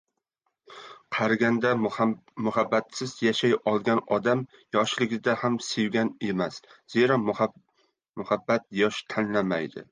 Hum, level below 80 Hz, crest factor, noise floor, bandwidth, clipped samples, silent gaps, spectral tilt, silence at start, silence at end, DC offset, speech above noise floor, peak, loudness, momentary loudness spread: none; -68 dBFS; 18 dB; -79 dBFS; 9.8 kHz; under 0.1%; 8.09-8.14 s; -5 dB/octave; 0.7 s; 0.1 s; under 0.1%; 53 dB; -8 dBFS; -26 LUFS; 8 LU